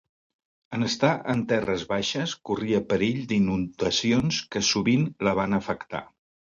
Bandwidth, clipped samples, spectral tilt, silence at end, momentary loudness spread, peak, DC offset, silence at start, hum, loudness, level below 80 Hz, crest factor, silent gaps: 7.6 kHz; under 0.1%; -4.5 dB/octave; 0.55 s; 7 LU; -8 dBFS; under 0.1%; 0.7 s; none; -25 LUFS; -54 dBFS; 18 dB; none